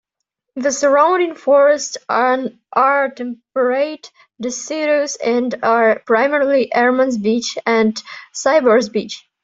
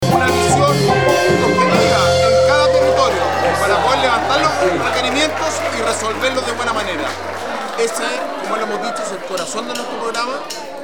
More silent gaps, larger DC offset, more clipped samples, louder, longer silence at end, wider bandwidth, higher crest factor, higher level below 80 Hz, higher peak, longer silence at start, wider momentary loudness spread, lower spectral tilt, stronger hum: neither; second, under 0.1% vs 1%; neither; about the same, -16 LUFS vs -16 LUFS; first, 0.25 s vs 0 s; second, 7.8 kHz vs 19.5 kHz; about the same, 14 dB vs 16 dB; second, -66 dBFS vs -48 dBFS; about the same, -2 dBFS vs 0 dBFS; first, 0.55 s vs 0 s; about the same, 11 LU vs 10 LU; about the same, -3.5 dB/octave vs -4 dB/octave; neither